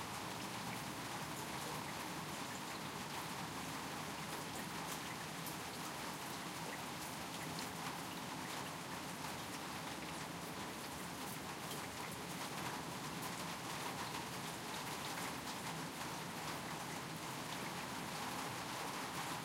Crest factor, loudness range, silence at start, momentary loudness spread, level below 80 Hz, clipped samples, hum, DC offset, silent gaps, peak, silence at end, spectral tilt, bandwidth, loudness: 16 dB; 1 LU; 0 s; 2 LU; -70 dBFS; under 0.1%; none; under 0.1%; none; -30 dBFS; 0 s; -3 dB/octave; 16 kHz; -45 LUFS